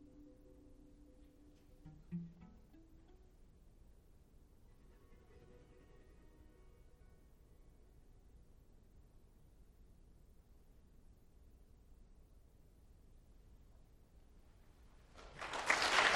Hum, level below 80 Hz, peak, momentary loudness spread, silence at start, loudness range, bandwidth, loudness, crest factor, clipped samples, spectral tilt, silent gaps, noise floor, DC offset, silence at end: none; -64 dBFS; -16 dBFS; 19 LU; 0.15 s; 11 LU; 16.5 kHz; -38 LUFS; 32 dB; under 0.1%; -2 dB/octave; none; -64 dBFS; under 0.1%; 0 s